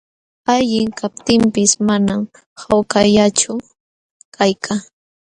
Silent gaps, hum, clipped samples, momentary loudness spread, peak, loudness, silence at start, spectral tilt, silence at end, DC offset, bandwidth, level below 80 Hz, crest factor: 2.46-2.56 s, 3.80-4.32 s; none; under 0.1%; 11 LU; 0 dBFS; -16 LUFS; 0.5 s; -4 dB/octave; 0.5 s; under 0.1%; 10.5 kHz; -48 dBFS; 16 dB